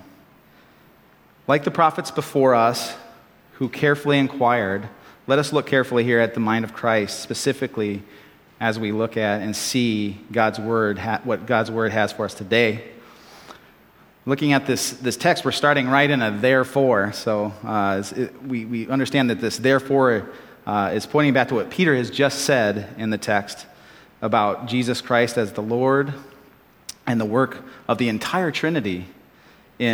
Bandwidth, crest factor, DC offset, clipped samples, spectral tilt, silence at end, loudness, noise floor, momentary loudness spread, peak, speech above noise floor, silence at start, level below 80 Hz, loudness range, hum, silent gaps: 18.5 kHz; 20 dB; under 0.1%; under 0.1%; -5 dB/octave; 0 s; -21 LUFS; -53 dBFS; 10 LU; 0 dBFS; 33 dB; 1.5 s; -64 dBFS; 4 LU; none; none